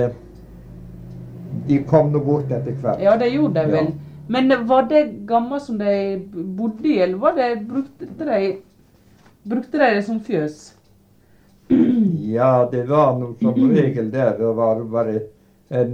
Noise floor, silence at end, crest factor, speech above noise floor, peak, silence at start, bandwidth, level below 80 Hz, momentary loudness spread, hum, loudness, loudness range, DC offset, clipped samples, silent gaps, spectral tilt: -54 dBFS; 0 s; 18 dB; 35 dB; -2 dBFS; 0 s; 9 kHz; -52 dBFS; 14 LU; none; -19 LUFS; 5 LU; under 0.1%; under 0.1%; none; -8.5 dB/octave